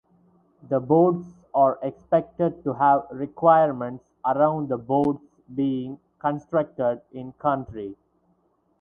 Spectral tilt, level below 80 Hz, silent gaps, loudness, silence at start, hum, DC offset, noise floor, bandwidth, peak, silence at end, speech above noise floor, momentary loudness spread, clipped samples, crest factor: -10 dB/octave; -62 dBFS; none; -23 LUFS; 0.65 s; none; under 0.1%; -67 dBFS; 3.8 kHz; -4 dBFS; 0.85 s; 44 dB; 15 LU; under 0.1%; 20 dB